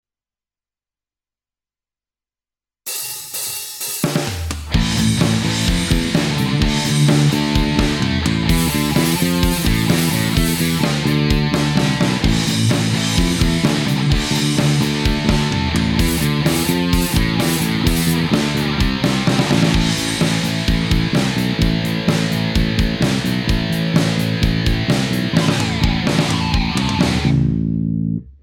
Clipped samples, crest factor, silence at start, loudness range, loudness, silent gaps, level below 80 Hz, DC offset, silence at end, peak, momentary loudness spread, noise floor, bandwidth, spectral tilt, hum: under 0.1%; 14 dB; 2.85 s; 4 LU; -17 LUFS; none; -26 dBFS; under 0.1%; 0.1 s; -4 dBFS; 4 LU; under -90 dBFS; 18 kHz; -5 dB/octave; none